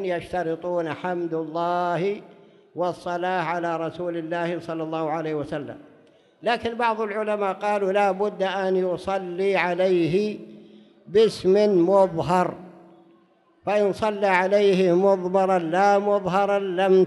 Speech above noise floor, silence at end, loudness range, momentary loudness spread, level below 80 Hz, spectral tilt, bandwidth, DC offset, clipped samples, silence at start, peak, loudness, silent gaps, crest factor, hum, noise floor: 37 dB; 0 s; 7 LU; 10 LU; -62 dBFS; -6.5 dB/octave; 11.5 kHz; under 0.1%; under 0.1%; 0 s; -6 dBFS; -23 LUFS; none; 16 dB; none; -59 dBFS